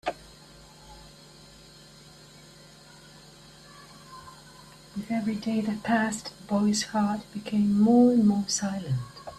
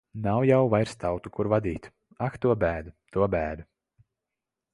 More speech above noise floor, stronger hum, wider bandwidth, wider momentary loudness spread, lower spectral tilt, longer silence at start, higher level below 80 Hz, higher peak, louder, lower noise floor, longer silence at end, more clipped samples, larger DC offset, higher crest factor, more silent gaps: second, 26 dB vs 61 dB; neither; first, 13 kHz vs 11.5 kHz; first, 28 LU vs 12 LU; second, -5 dB/octave vs -8 dB/octave; about the same, 0.05 s vs 0.15 s; second, -60 dBFS vs -48 dBFS; about the same, -10 dBFS vs -8 dBFS; about the same, -26 LUFS vs -27 LUFS; second, -51 dBFS vs -87 dBFS; second, 0 s vs 1.1 s; neither; neither; about the same, 18 dB vs 20 dB; neither